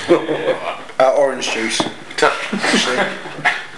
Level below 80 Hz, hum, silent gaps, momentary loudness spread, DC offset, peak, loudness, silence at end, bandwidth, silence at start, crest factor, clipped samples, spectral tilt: -60 dBFS; none; none; 7 LU; 1%; 0 dBFS; -17 LUFS; 0 s; 12 kHz; 0 s; 18 dB; under 0.1%; -3 dB/octave